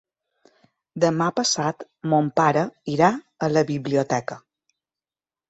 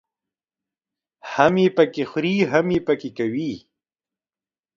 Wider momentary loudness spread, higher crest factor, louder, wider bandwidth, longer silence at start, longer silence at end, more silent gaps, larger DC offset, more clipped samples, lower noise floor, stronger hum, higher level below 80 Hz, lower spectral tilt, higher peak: second, 9 LU vs 13 LU; about the same, 20 dB vs 22 dB; about the same, -22 LUFS vs -21 LUFS; first, 8.2 kHz vs 7.4 kHz; second, 0.95 s vs 1.25 s; about the same, 1.1 s vs 1.2 s; neither; neither; neither; about the same, under -90 dBFS vs under -90 dBFS; neither; second, -64 dBFS vs -58 dBFS; second, -5 dB/octave vs -6.5 dB/octave; second, -4 dBFS vs 0 dBFS